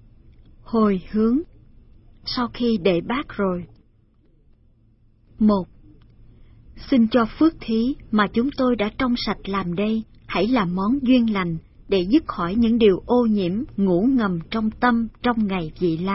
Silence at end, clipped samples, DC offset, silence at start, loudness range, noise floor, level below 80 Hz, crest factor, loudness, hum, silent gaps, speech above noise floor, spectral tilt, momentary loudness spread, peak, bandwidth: 0 s; under 0.1%; under 0.1%; 0.65 s; 6 LU; -57 dBFS; -44 dBFS; 18 dB; -21 LUFS; none; none; 37 dB; -10 dB/octave; 7 LU; -4 dBFS; 5.8 kHz